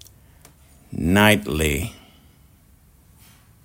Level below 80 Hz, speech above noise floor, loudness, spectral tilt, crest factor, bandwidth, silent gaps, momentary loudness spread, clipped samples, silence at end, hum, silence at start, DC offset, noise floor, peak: -40 dBFS; 35 dB; -19 LUFS; -4.5 dB/octave; 24 dB; 16.5 kHz; none; 17 LU; under 0.1%; 1.75 s; none; 0.9 s; under 0.1%; -53 dBFS; -2 dBFS